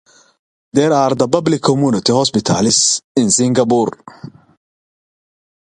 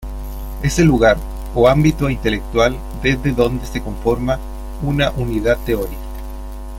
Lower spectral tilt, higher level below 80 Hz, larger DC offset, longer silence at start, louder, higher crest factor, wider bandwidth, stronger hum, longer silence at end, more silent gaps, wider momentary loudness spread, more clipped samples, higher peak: second, -4 dB/octave vs -6 dB/octave; second, -52 dBFS vs -26 dBFS; neither; first, 0.75 s vs 0 s; first, -14 LUFS vs -17 LUFS; about the same, 16 dB vs 16 dB; second, 11 kHz vs 16.5 kHz; neither; first, 1.4 s vs 0 s; first, 3.04-3.15 s vs none; second, 5 LU vs 17 LU; neither; about the same, 0 dBFS vs -2 dBFS